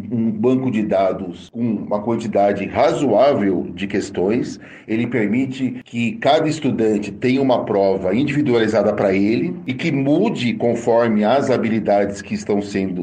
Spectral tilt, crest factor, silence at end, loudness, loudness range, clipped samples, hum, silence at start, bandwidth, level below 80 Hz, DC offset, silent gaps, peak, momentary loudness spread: -6.5 dB/octave; 16 dB; 0 s; -18 LUFS; 2 LU; under 0.1%; none; 0 s; 9.4 kHz; -54 dBFS; under 0.1%; none; -2 dBFS; 7 LU